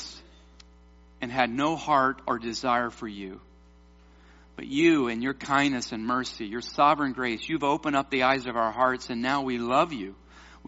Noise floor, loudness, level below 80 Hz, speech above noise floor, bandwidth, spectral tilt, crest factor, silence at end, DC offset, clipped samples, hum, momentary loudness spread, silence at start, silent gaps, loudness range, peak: -54 dBFS; -26 LUFS; -56 dBFS; 28 dB; 8 kHz; -3 dB/octave; 20 dB; 0 s; under 0.1%; under 0.1%; none; 14 LU; 0 s; none; 3 LU; -6 dBFS